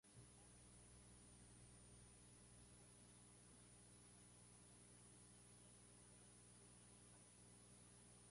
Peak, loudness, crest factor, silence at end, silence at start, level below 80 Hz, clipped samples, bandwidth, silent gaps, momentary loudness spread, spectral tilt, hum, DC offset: -52 dBFS; -66 LUFS; 14 dB; 0 s; 0.05 s; -76 dBFS; under 0.1%; 11.5 kHz; none; 1 LU; -3.5 dB/octave; 60 Hz at -70 dBFS; under 0.1%